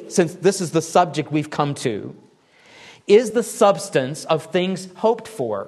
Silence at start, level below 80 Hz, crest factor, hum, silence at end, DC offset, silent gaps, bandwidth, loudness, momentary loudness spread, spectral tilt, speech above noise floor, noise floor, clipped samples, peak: 0 s; -66 dBFS; 18 dB; none; 0 s; under 0.1%; none; 12.5 kHz; -20 LUFS; 9 LU; -5 dB/octave; 33 dB; -53 dBFS; under 0.1%; -2 dBFS